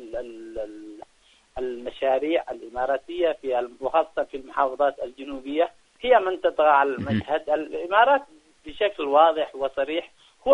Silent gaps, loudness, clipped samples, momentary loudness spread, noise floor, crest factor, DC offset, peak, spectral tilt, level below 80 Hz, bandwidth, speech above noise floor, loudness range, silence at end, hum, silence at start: none; -24 LUFS; under 0.1%; 16 LU; -60 dBFS; 20 dB; under 0.1%; -4 dBFS; -6 dB/octave; -56 dBFS; 10.5 kHz; 36 dB; 6 LU; 0 s; none; 0 s